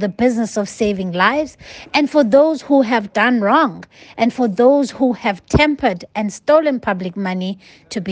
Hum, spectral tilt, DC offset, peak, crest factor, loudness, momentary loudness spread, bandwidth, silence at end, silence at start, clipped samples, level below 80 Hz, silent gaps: none; -5.5 dB/octave; under 0.1%; 0 dBFS; 16 dB; -16 LUFS; 12 LU; 9.6 kHz; 0 s; 0 s; under 0.1%; -42 dBFS; none